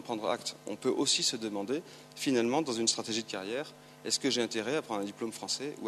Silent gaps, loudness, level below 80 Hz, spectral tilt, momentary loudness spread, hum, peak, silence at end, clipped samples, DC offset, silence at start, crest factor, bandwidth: none; -32 LUFS; -78 dBFS; -2.5 dB/octave; 10 LU; none; -12 dBFS; 0 s; under 0.1%; under 0.1%; 0 s; 20 dB; 13.5 kHz